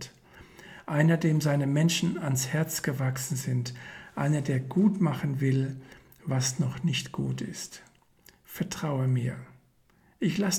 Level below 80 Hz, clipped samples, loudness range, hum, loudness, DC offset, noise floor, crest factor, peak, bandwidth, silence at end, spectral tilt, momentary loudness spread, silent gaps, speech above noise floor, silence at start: -62 dBFS; under 0.1%; 6 LU; none; -28 LUFS; under 0.1%; -64 dBFS; 20 dB; -10 dBFS; 17.5 kHz; 0 s; -5.5 dB/octave; 17 LU; none; 36 dB; 0 s